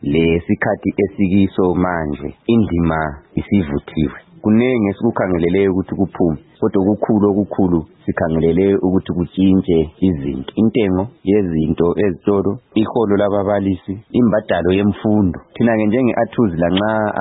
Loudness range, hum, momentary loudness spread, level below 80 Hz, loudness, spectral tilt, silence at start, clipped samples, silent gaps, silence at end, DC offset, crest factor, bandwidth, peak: 2 LU; none; 7 LU; -40 dBFS; -17 LUFS; -13 dB/octave; 0 s; under 0.1%; none; 0 s; under 0.1%; 14 dB; 4 kHz; -2 dBFS